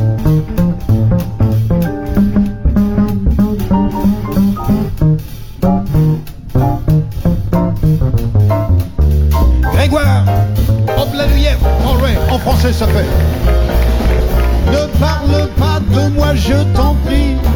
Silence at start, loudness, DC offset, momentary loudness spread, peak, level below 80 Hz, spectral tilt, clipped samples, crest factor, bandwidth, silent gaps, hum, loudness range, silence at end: 0 s; -13 LUFS; under 0.1%; 3 LU; -2 dBFS; -16 dBFS; -7.5 dB/octave; under 0.1%; 10 dB; 17.5 kHz; none; none; 2 LU; 0 s